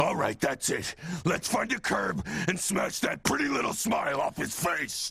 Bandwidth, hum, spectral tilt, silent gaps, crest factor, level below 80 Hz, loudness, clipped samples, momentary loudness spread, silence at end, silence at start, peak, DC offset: 15 kHz; none; -3.5 dB/octave; none; 20 dB; -56 dBFS; -29 LUFS; under 0.1%; 3 LU; 0 s; 0 s; -10 dBFS; under 0.1%